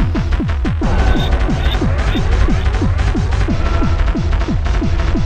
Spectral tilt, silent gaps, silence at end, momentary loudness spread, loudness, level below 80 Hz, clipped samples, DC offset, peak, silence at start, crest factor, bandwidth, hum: -7 dB/octave; none; 0 s; 2 LU; -17 LUFS; -16 dBFS; under 0.1%; 0.7%; -2 dBFS; 0 s; 12 dB; 8.8 kHz; none